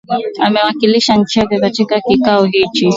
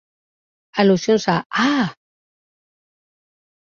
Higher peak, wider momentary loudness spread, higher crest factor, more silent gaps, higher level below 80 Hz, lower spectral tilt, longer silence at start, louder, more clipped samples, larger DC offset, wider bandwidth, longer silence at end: about the same, 0 dBFS vs -2 dBFS; second, 4 LU vs 8 LU; second, 12 dB vs 20 dB; second, none vs 1.46-1.50 s; first, -46 dBFS vs -62 dBFS; about the same, -5 dB/octave vs -5.5 dB/octave; second, 0.1 s vs 0.75 s; first, -12 LUFS vs -18 LUFS; neither; neither; about the same, 7.8 kHz vs 7.4 kHz; second, 0 s vs 1.75 s